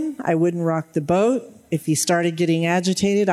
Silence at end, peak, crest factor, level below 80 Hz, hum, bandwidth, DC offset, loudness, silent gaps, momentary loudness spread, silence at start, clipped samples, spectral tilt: 0 s; -6 dBFS; 14 dB; -60 dBFS; none; 15 kHz; under 0.1%; -21 LUFS; none; 6 LU; 0 s; under 0.1%; -5 dB/octave